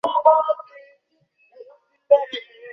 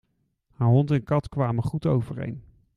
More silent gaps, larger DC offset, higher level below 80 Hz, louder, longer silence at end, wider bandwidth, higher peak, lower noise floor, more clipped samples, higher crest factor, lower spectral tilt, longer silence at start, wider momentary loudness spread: neither; neither; second, -78 dBFS vs -52 dBFS; first, -19 LUFS vs -25 LUFS; second, 0 s vs 0.35 s; second, 6.2 kHz vs 10.5 kHz; first, -2 dBFS vs -8 dBFS; second, -64 dBFS vs -69 dBFS; neither; about the same, 20 dB vs 18 dB; second, -3.5 dB/octave vs -9.5 dB/octave; second, 0.05 s vs 0.6 s; about the same, 15 LU vs 13 LU